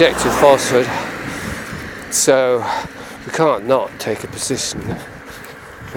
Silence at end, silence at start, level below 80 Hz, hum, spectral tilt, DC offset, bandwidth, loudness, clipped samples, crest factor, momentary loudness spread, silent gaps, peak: 0 s; 0 s; -44 dBFS; none; -3.5 dB/octave; under 0.1%; 19 kHz; -17 LUFS; under 0.1%; 18 dB; 20 LU; none; 0 dBFS